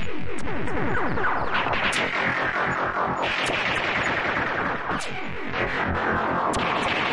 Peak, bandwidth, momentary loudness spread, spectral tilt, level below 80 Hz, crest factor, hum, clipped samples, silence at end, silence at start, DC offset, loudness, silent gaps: -10 dBFS; 11.5 kHz; 7 LU; -4 dB/octave; -44 dBFS; 14 dB; none; under 0.1%; 0 s; 0 s; under 0.1%; -24 LUFS; none